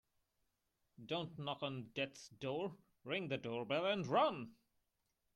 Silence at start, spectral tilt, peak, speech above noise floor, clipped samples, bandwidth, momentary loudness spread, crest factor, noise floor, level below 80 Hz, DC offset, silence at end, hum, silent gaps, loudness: 1 s; -5.5 dB/octave; -22 dBFS; 44 dB; under 0.1%; 12 kHz; 13 LU; 20 dB; -85 dBFS; -82 dBFS; under 0.1%; 0.8 s; none; none; -41 LUFS